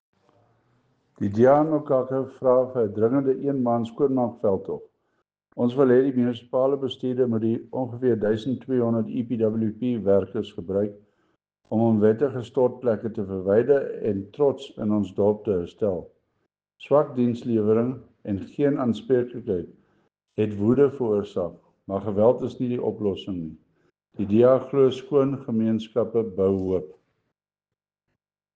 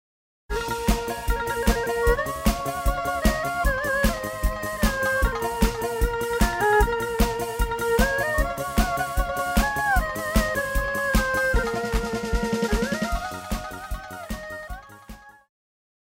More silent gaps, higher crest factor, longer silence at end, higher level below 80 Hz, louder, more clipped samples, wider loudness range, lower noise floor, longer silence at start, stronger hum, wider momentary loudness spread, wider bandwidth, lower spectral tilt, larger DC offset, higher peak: neither; about the same, 18 dB vs 18 dB; first, 1.65 s vs 0.75 s; second, -64 dBFS vs -30 dBFS; about the same, -24 LUFS vs -25 LUFS; neither; about the same, 3 LU vs 5 LU; first, -89 dBFS vs -45 dBFS; first, 1.2 s vs 0.5 s; neither; about the same, 11 LU vs 10 LU; second, 7.6 kHz vs 16.5 kHz; first, -9 dB/octave vs -4.5 dB/octave; neither; about the same, -6 dBFS vs -6 dBFS